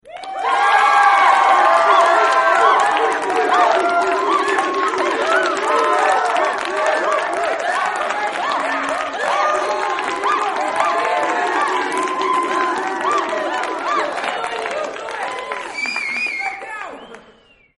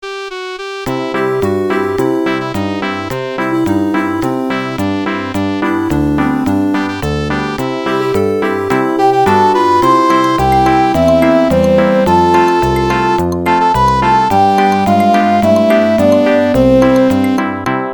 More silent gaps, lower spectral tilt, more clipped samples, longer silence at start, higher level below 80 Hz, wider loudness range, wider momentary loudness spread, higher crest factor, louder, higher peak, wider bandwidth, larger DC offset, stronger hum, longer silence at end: neither; second, -1.5 dB/octave vs -6.5 dB/octave; neither; about the same, 0.05 s vs 0 s; second, -62 dBFS vs -34 dBFS; about the same, 8 LU vs 6 LU; first, 11 LU vs 8 LU; about the same, 16 dB vs 12 dB; second, -17 LUFS vs -12 LUFS; about the same, -2 dBFS vs 0 dBFS; second, 11.5 kHz vs 19 kHz; neither; neither; first, 0.55 s vs 0 s